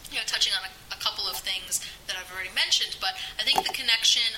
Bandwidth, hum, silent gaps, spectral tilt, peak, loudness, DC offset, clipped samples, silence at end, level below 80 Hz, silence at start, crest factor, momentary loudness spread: 16.5 kHz; none; none; 1.5 dB/octave; -6 dBFS; -25 LUFS; under 0.1%; under 0.1%; 0 s; -56 dBFS; 0 s; 22 dB; 11 LU